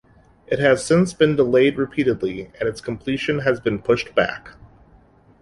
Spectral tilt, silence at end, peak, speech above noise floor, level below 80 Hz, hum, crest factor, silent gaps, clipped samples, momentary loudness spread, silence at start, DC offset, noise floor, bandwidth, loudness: -6 dB/octave; 0.9 s; -2 dBFS; 33 dB; -50 dBFS; none; 18 dB; none; under 0.1%; 10 LU; 0.5 s; under 0.1%; -52 dBFS; 11.5 kHz; -20 LUFS